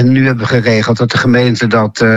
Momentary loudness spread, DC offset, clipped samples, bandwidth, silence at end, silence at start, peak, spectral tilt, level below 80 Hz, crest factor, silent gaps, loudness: 2 LU; under 0.1%; under 0.1%; 8 kHz; 0 s; 0 s; 0 dBFS; -6.5 dB/octave; -42 dBFS; 10 dB; none; -11 LUFS